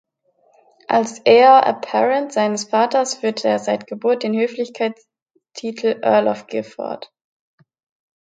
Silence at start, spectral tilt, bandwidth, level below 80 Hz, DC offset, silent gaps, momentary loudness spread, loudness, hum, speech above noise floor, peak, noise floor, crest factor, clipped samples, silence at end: 0.9 s; -4 dB/octave; 9.4 kHz; -74 dBFS; under 0.1%; 5.22-5.26 s; 17 LU; -18 LUFS; none; 43 dB; 0 dBFS; -60 dBFS; 18 dB; under 0.1%; 1.2 s